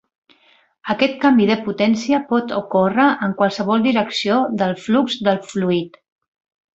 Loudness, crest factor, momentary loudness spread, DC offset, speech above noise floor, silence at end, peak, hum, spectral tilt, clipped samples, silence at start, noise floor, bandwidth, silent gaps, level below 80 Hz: -18 LUFS; 18 dB; 6 LU; under 0.1%; 39 dB; 0.85 s; -2 dBFS; none; -6 dB/octave; under 0.1%; 0.85 s; -56 dBFS; 8 kHz; none; -60 dBFS